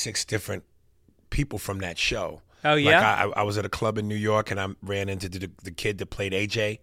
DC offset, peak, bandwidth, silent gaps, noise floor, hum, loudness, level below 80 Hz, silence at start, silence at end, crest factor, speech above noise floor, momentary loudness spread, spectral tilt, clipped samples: under 0.1%; -4 dBFS; 16.5 kHz; none; -61 dBFS; none; -26 LUFS; -44 dBFS; 0 s; 0.05 s; 22 dB; 35 dB; 16 LU; -4 dB/octave; under 0.1%